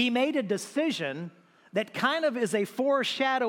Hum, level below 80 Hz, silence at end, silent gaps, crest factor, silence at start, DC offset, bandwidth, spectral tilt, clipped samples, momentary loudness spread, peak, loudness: none; -82 dBFS; 0 s; none; 18 dB; 0 s; under 0.1%; 17 kHz; -4 dB/octave; under 0.1%; 8 LU; -10 dBFS; -28 LUFS